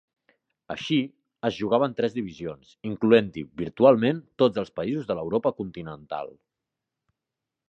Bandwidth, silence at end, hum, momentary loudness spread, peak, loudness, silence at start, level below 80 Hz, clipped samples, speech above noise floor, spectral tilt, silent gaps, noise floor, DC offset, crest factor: 7.6 kHz; 1.4 s; none; 17 LU; -4 dBFS; -25 LUFS; 0.7 s; -60 dBFS; under 0.1%; 62 dB; -7 dB/octave; none; -87 dBFS; under 0.1%; 22 dB